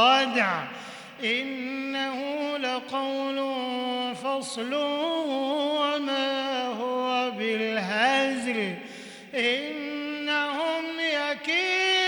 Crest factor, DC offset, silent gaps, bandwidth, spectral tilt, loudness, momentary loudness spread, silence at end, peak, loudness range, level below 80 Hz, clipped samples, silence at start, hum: 18 dB; under 0.1%; none; 19 kHz; -3 dB/octave; -27 LUFS; 9 LU; 0 s; -8 dBFS; 3 LU; -76 dBFS; under 0.1%; 0 s; none